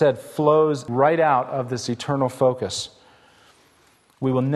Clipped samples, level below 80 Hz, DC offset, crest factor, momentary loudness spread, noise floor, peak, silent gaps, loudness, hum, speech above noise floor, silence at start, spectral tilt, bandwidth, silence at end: under 0.1%; -62 dBFS; under 0.1%; 18 dB; 10 LU; -58 dBFS; -4 dBFS; none; -21 LUFS; none; 38 dB; 0 s; -6 dB/octave; 12.5 kHz; 0 s